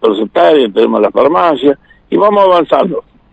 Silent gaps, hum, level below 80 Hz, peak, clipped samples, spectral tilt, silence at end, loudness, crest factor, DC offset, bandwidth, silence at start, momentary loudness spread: none; none; -50 dBFS; 0 dBFS; under 0.1%; -7 dB/octave; 0.35 s; -10 LUFS; 10 dB; under 0.1%; 8.2 kHz; 0 s; 9 LU